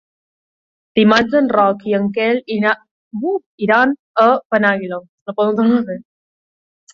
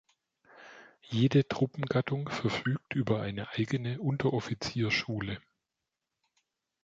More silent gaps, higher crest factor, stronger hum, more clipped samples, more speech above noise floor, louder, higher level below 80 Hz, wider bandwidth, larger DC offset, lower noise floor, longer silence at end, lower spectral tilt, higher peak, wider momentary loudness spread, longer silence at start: first, 2.91-3.11 s, 3.46-3.58 s, 3.99-4.14 s, 4.45-4.50 s, 5.09-5.26 s vs none; about the same, 16 dB vs 18 dB; neither; neither; first, over 75 dB vs 57 dB; first, -16 LUFS vs -31 LUFS; about the same, -58 dBFS vs -62 dBFS; about the same, 7.2 kHz vs 7.8 kHz; neither; about the same, under -90 dBFS vs -87 dBFS; second, 0.95 s vs 1.45 s; about the same, -6.5 dB/octave vs -6.5 dB/octave; first, -2 dBFS vs -14 dBFS; first, 13 LU vs 10 LU; first, 0.95 s vs 0.55 s